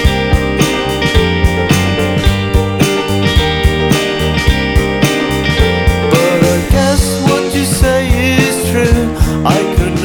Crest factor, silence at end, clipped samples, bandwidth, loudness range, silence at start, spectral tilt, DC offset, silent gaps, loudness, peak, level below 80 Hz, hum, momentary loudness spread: 12 dB; 0 s; under 0.1%; 20 kHz; 1 LU; 0 s; -5 dB/octave; under 0.1%; none; -12 LUFS; 0 dBFS; -18 dBFS; none; 2 LU